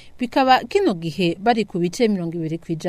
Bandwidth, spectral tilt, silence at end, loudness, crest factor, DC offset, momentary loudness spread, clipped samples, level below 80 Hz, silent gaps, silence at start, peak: 15 kHz; -5.5 dB/octave; 0 s; -20 LUFS; 16 dB; under 0.1%; 9 LU; under 0.1%; -52 dBFS; none; 0.05 s; -4 dBFS